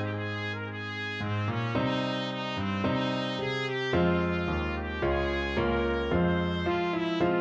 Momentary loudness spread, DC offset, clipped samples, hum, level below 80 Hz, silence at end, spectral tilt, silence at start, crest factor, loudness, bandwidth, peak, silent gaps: 6 LU; under 0.1%; under 0.1%; none; -44 dBFS; 0 s; -7 dB/octave; 0 s; 14 dB; -29 LUFS; 8 kHz; -14 dBFS; none